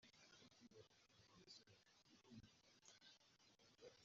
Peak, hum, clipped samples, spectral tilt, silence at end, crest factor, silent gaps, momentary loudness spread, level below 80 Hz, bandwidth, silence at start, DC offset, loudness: -46 dBFS; none; under 0.1%; -3 dB/octave; 0 s; 24 dB; none; 4 LU; -90 dBFS; 7.4 kHz; 0 s; under 0.1%; -68 LUFS